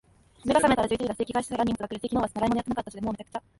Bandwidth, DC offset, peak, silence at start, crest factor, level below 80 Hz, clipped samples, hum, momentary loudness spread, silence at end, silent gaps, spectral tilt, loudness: 11.5 kHz; under 0.1%; -8 dBFS; 0.45 s; 18 dB; -50 dBFS; under 0.1%; none; 11 LU; 0.2 s; none; -5 dB/octave; -27 LUFS